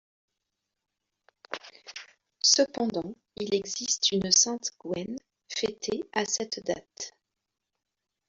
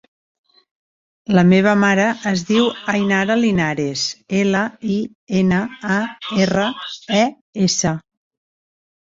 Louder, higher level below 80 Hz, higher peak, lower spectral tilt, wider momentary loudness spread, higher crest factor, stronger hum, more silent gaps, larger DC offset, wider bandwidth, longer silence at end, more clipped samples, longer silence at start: second, -27 LUFS vs -18 LUFS; second, -68 dBFS vs -52 dBFS; second, -6 dBFS vs -2 dBFS; second, -1.5 dB/octave vs -5 dB/octave; first, 20 LU vs 9 LU; first, 26 dB vs 16 dB; neither; second, none vs 5.15-5.27 s, 7.41-7.53 s; neither; about the same, 8 kHz vs 7.8 kHz; first, 1.2 s vs 1.05 s; neither; first, 1.5 s vs 1.3 s